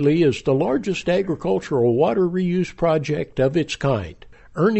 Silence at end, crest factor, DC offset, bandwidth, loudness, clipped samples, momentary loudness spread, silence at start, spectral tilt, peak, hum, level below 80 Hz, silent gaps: 0 s; 14 dB; under 0.1%; 8.2 kHz; -21 LUFS; under 0.1%; 5 LU; 0 s; -7 dB/octave; -6 dBFS; none; -46 dBFS; none